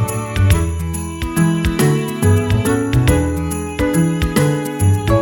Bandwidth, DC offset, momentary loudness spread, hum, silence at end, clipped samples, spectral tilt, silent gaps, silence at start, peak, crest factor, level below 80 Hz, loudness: 17.5 kHz; under 0.1%; 7 LU; none; 0 s; under 0.1%; -6 dB/octave; none; 0 s; 0 dBFS; 14 dB; -26 dBFS; -16 LUFS